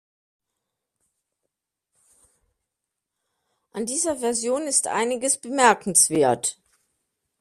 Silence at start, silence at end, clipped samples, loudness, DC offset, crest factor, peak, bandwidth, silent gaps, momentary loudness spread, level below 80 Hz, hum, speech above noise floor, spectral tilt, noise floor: 3.75 s; 0.9 s; under 0.1%; -21 LUFS; under 0.1%; 24 dB; -2 dBFS; 14.5 kHz; none; 10 LU; -68 dBFS; none; 62 dB; -2 dB/octave; -84 dBFS